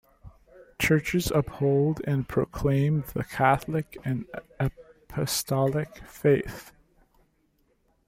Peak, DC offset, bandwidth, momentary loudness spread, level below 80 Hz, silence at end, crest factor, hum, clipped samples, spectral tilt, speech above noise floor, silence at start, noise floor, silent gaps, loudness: -6 dBFS; under 0.1%; 16 kHz; 10 LU; -48 dBFS; 1.4 s; 20 dB; none; under 0.1%; -6 dB/octave; 42 dB; 0.25 s; -68 dBFS; none; -27 LUFS